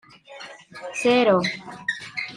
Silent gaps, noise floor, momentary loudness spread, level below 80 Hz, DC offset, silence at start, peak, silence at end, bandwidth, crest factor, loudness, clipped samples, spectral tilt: none; -43 dBFS; 22 LU; -66 dBFS; under 0.1%; 0.3 s; -8 dBFS; 0 s; 11 kHz; 18 dB; -22 LUFS; under 0.1%; -4.5 dB/octave